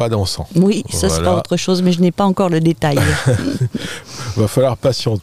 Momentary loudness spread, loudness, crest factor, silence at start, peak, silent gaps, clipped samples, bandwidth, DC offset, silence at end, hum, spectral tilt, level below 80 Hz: 6 LU; -16 LUFS; 12 dB; 0 s; -2 dBFS; none; under 0.1%; 15.5 kHz; 1%; 0 s; none; -5.5 dB/octave; -40 dBFS